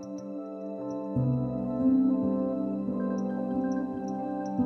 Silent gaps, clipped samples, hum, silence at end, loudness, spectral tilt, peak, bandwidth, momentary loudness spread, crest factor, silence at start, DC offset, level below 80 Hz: none; under 0.1%; none; 0 s; -30 LUFS; -10 dB/octave; -16 dBFS; 6.4 kHz; 12 LU; 14 dB; 0 s; under 0.1%; -58 dBFS